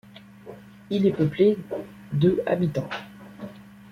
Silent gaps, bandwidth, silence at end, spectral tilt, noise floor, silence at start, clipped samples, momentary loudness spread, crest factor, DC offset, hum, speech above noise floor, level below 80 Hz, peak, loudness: none; 14.5 kHz; 0.25 s; -8.5 dB/octave; -45 dBFS; 0.15 s; under 0.1%; 23 LU; 18 dB; under 0.1%; none; 21 dB; -58 dBFS; -8 dBFS; -24 LUFS